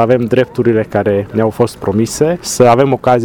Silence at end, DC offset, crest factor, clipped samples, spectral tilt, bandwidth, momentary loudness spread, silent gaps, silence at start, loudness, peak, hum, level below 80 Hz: 0 s; under 0.1%; 12 dB; 0.1%; -6 dB/octave; 18.5 kHz; 6 LU; none; 0 s; -13 LUFS; 0 dBFS; none; -42 dBFS